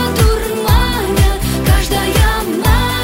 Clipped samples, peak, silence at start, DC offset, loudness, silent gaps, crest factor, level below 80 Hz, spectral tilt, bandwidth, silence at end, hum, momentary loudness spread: under 0.1%; 0 dBFS; 0 s; under 0.1%; -14 LUFS; none; 12 dB; -16 dBFS; -5 dB/octave; 16.5 kHz; 0 s; none; 2 LU